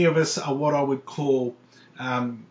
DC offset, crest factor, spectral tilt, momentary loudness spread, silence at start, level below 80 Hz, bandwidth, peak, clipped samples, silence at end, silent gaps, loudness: under 0.1%; 16 dB; -5.5 dB/octave; 6 LU; 0 s; -74 dBFS; 8 kHz; -8 dBFS; under 0.1%; 0.05 s; none; -25 LUFS